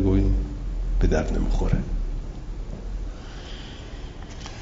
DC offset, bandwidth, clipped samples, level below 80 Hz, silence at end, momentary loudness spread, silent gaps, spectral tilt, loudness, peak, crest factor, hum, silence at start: under 0.1%; 7.6 kHz; under 0.1%; -26 dBFS; 0 s; 15 LU; none; -7 dB/octave; -29 LUFS; -8 dBFS; 18 dB; none; 0 s